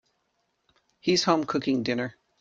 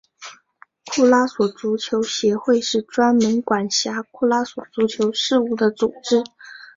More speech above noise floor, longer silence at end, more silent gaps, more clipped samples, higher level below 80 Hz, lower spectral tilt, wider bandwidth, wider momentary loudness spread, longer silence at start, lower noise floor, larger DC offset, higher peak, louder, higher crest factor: first, 50 dB vs 34 dB; first, 0.3 s vs 0.1 s; neither; neither; about the same, -68 dBFS vs -64 dBFS; about the same, -4.5 dB/octave vs -3.5 dB/octave; first, 8.8 kHz vs 7.8 kHz; about the same, 9 LU vs 10 LU; first, 1.05 s vs 0.2 s; first, -75 dBFS vs -53 dBFS; neither; second, -8 dBFS vs -2 dBFS; second, -26 LUFS vs -20 LUFS; about the same, 22 dB vs 18 dB